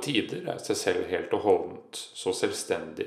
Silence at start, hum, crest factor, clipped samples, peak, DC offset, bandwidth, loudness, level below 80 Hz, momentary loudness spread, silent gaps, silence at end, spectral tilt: 0 s; none; 20 dB; under 0.1%; -10 dBFS; under 0.1%; 15 kHz; -29 LUFS; -74 dBFS; 10 LU; none; 0 s; -3.5 dB/octave